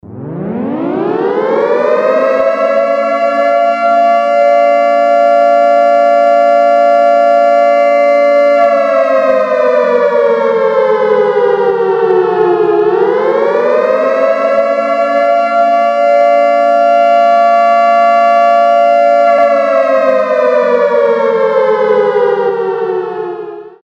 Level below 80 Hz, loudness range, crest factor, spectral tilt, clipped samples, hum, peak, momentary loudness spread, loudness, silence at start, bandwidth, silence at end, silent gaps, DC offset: -60 dBFS; 3 LU; 10 dB; -6 dB/octave; under 0.1%; none; 0 dBFS; 5 LU; -9 LUFS; 0.05 s; 8 kHz; 0.15 s; none; under 0.1%